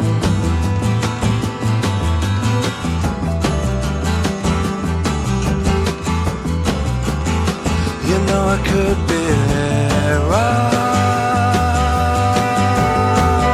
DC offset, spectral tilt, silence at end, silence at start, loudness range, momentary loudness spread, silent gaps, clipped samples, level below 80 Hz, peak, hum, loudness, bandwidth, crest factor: under 0.1%; -6 dB/octave; 0 s; 0 s; 3 LU; 5 LU; none; under 0.1%; -26 dBFS; -2 dBFS; none; -17 LUFS; 15 kHz; 14 dB